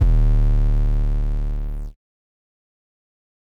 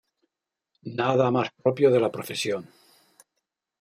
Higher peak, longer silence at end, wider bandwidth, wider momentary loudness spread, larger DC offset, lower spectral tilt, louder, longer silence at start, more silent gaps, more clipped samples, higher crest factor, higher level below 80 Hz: about the same, -8 dBFS vs -6 dBFS; first, 1.5 s vs 1.15 s; second, 2.8 kHz vs 16 kHz; about the same, 14 LU vs 13 LU; neither; first, -9 dB/octave vs -5.5 dB/octave; about the same, -23 LUFS vs -24 LUFS; second, 0 s vs 0.85 s; neither; neither; second, 12 dB vs 20 dB; first, -20 dBFS vs -72 dBFS